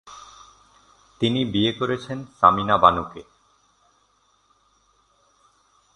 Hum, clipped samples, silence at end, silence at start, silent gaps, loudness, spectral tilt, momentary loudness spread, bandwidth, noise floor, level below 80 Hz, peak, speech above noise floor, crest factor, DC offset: none; under 0.1%; 2.75 s; 0.05 s; none; -20 LUFS; -6 dB/octave; 24 LU; 10.5 kHz; -64 dBFS; -52 dBFS; 0 dBFS; 43 dB; 24 dB; under 0.1%